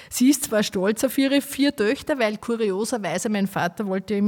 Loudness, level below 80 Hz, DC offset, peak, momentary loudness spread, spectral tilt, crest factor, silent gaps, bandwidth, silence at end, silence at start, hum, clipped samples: -23 LUFS; -60 dBFS; under 0.1%; -8 dBFS; 6 LU; -4 dB/octave; 14 dB; none; 18 kHz; 0 s; 0 s; none; under 0.1%